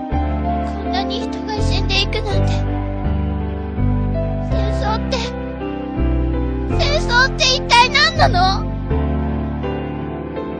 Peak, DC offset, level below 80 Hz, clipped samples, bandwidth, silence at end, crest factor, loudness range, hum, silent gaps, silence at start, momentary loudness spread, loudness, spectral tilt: 0 dBFS; under 0.1%; -24 dBFS; under 0.1%; 9.8 kHz; 0 s; 18 dB; 6 LU; none; none; 0 s; 12 LU; -18 LUFS; -5 dB/octave